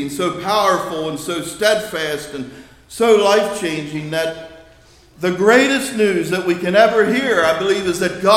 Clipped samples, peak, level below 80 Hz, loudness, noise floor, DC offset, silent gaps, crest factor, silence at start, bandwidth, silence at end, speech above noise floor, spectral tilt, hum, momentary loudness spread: under 0.1%; 0 dBFS; -52 dBFS; -17 LUFS; -47 dBFS; under 0.1%; none; 16 dB; 0 s; 16.5 kHz; 0 s; 31 dB; -4 dB/octave; none; 12 LU